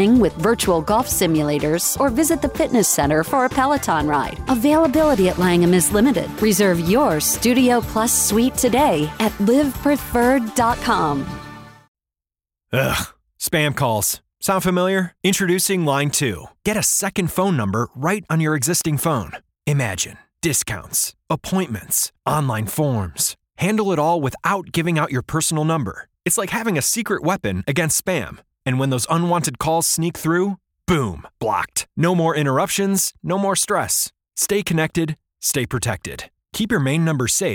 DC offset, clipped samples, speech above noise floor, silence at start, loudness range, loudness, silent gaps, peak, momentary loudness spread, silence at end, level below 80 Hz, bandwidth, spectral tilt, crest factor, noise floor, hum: under 0.1%; under 0.1%; 71 dB; 0 s; 5 LU; -19 LUFS; 11.88-11.95 s; -4 dBFS; 8 LU; 0 s; -42 dBFS; 19.5 kHz; -4.5 dB/octave; 16 dB; -90 dBFS; none